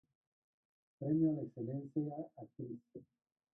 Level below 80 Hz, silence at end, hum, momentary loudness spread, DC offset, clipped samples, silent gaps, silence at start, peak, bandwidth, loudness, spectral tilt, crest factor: -80 dBFS; 0.55 s; none; 18 LU; under 0.1%; under 0.1%; none; 1 s; -24 dBFS; 2 kHz; -40 LUFS; -12.5 dB/octave; 18 dB